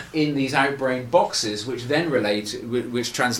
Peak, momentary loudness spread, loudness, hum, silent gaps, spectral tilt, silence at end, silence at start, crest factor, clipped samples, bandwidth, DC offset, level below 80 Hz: -4 dBFS; 6 LU; -23 LUFS; none; none; -4 dB/octave; 0 s; 0 s; 20 dB; under 0.1%; 18 kHz; under 0.1%; -56 dBFS